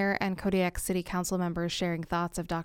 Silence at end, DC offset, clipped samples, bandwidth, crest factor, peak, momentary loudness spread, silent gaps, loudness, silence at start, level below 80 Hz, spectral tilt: 0 s; under 0.1%; under 0.1%; 17 kHz; 16 dB; -14 dBFS; 3 LU; none; -31 LUFS; 0 s; -48 dBFS; -5 dB/octave